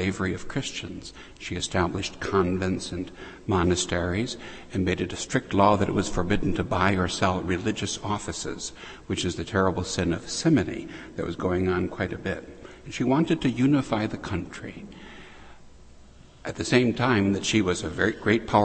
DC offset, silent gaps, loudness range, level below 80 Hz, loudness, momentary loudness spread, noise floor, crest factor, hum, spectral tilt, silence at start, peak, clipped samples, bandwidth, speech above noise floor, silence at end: under 0.1%; none; 4 LU; -46 dBFS; -26 LUFS; 15 LU; -49 dBFS; 20 dB; none; -5 dB/octave; 0 s; -6 dBFS; under 0.1%; 8.8 kHz; 23 dB; 0 s